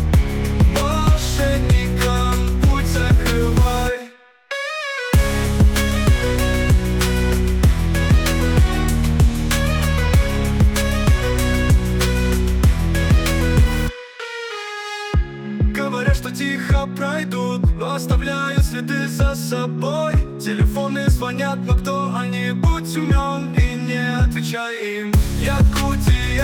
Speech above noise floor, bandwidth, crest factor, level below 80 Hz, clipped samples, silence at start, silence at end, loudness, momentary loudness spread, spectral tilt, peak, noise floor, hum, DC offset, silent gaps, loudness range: 19 dB; 18.5 kHz; 12 dB; -20 dBFS; under 0.1%; 0 s; 0 s; -19 LUFS; 6 LU; -5.5 dB/octave; -6 dBFS; -41 dBFS; none; under 0.1%; none; 3 LU